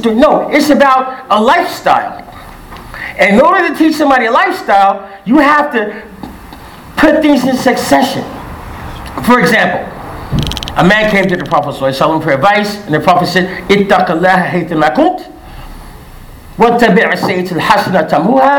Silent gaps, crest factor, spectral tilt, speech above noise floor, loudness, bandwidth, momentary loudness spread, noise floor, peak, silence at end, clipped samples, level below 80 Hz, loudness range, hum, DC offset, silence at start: none; 10 dB; -5.5 dB/octave; 22 dB; -10 LUFS; 19.5 kHz; 17 LU; -32 dBFS; 0 dBFS; 0 s; 0.7%; -34 dBFS; 3 LU; none; under 0.1%; 0 s